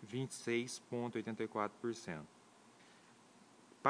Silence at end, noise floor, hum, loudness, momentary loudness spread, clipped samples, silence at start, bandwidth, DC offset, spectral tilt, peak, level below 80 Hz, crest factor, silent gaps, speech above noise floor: 0 s; -64 dBFS; none; -42 LUFS; 24 LU; under 0.1%; 0 s; 10.5 kHz; under 0.1%; -5 dB/octave; -16 dBFS; -84 dBFS; 28 dB; none; 23 dB